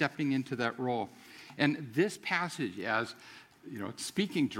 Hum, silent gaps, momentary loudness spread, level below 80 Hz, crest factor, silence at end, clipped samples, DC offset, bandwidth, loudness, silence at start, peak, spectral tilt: none; none; 18 LU; -78 dBFS; 24 dB; 0 s; under 0.1%; under 0.1%; 16.5 kHz; -33 LUFS; 0 s; -10 dBFS; -5 dB/octave